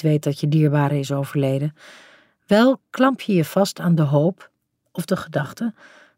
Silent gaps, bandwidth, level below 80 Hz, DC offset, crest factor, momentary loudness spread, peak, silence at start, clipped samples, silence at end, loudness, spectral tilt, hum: none; 16 kHz; -66 dBFS; under 0.1%; 18 dB; 11 LU; -2 dBFS; 0 s; under 0.1%; 0.45 s; -20 LUFS; -7 dB/octave; none